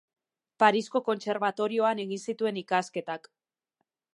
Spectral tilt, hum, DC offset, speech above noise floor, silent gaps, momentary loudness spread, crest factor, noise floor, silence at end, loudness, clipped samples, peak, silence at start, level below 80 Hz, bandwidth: -4.5 dB/octave; none; under 0.1%; 54 dB; none; 11 LU; 24 dB; -82 dBFS; 0.95 s; -28 LUFS; under 0.1%; -6 dBFS; 0.6 s; -84 dBFS; 11.5 kHz